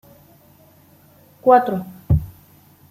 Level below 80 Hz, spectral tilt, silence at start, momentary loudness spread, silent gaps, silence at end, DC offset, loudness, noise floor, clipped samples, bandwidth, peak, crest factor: -38 dBFS; -9 dB/octave; 1.45 s; 14 LU; none; 0.65 s; under 0.1%; -18 LUFS; -51 dBFS; under 0.1%; 15.5 kHz; -2 dBFS; 20 dB